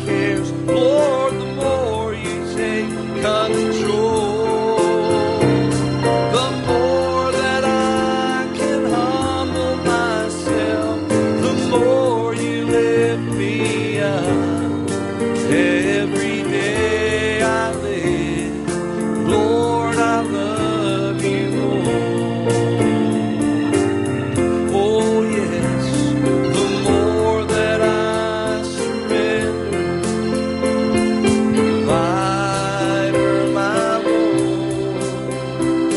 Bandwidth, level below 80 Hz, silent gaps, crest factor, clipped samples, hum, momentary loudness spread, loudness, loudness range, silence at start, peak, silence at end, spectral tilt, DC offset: 11.5 kHz; -46 dBFS; none; 14 dB; under 0.1%; none; 5 LU; -18 LUFS; 2 LU; 0 s; -2 dBFS; 0 s; -5.5 dB/octave; under 0.1%